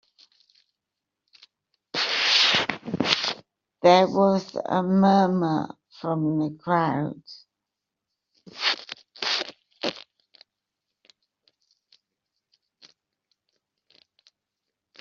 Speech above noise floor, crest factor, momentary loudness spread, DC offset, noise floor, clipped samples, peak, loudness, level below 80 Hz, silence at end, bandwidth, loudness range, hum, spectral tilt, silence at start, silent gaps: 64 dB; 24 dB; 15 LU; under 0.1%; -85 dBFS; under 0.1%; -2 dBFS; -23 LUFS; -70 dBFS; 5 s; 7.4 kHz; 12 LU; none; -3 dB/octave; 1.95 s; none